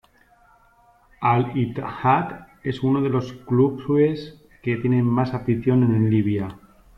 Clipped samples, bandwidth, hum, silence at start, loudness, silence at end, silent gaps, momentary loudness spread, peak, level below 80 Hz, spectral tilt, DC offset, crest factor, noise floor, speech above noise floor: under 0.1%; 6.2 kHz; none; 1.2 s; -22 LUFS; 0.4 s; none; 12 LU; -6 dBFS; -52 dBFS; -9.5 dB/octave; under 0.1%; 16 dB; -56 dBFS; 36 dB